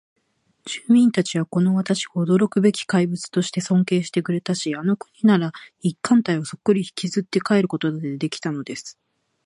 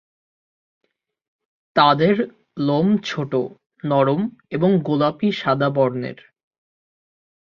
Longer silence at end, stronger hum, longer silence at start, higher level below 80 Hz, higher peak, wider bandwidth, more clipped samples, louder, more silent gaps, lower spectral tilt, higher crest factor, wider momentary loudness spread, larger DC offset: second, 0.55 s vs 1.3 s; neither; second, 0.65 s vs 1.75 s; second, -68 dBFS vs -62 dBFS; about the same, -4 dBFS vs -2 dBFS; first, 11 kHz vs 7 kHz; neither; about the same, -21 LUFS vs -20 LUFS; second, none vs 3.66-3.70 s; second, -6 dB/octave vs -7.5 dB/octave; about the same, 18 dB vs 20 dB; about the same, 9 LU vs 11 LU; neither